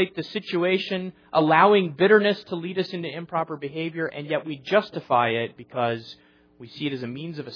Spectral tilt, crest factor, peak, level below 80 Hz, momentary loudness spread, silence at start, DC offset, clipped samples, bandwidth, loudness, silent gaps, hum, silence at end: -7.5 dB/octave; 20 dB; -4 dBFS; -72 dBFS; 14 LU; 0 s; under 0.1%; under 0.1%; 5.4 kHz; -24 LUFS; none; none; 0 s